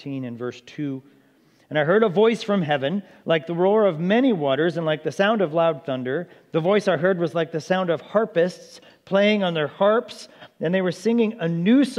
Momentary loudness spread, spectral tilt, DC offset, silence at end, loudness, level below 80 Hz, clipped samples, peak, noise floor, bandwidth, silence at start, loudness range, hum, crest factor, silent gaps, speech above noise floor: 12 LU; -6.5 dB/octave; under 0.1%; 0 s; -22 LUFS; -76 dBFS; under 0.1%; -4 dBFS; -58 dBFS; 12 kHz; 0.05 s; 2 LU; none; 18 dB; none; 36 dB